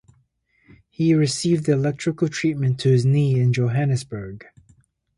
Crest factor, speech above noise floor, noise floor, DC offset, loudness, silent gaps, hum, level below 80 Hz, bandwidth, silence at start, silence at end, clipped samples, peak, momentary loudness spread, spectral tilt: 14 dB; 44 dB; -64 dBFS; under 0.1%; -20 LUFS; none; none; -56 dBFS; 11.5 kHz; 1 s; 0.75 s; under 0.1%; -8 dBFS; 11 LU; -6.5 dB/octave